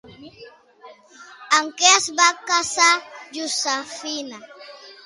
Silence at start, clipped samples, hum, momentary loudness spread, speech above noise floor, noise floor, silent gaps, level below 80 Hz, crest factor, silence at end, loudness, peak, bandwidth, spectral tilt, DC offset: 0.05 s; under 0.1%; none; 21 LU; 27 dB; -47 dBFS; none; -68 dBFS; 22 dB; 0.15 s; -18 LUFS; -2 dBFS; 11.5 kHz; 1.5 dB/octave; under 0.1%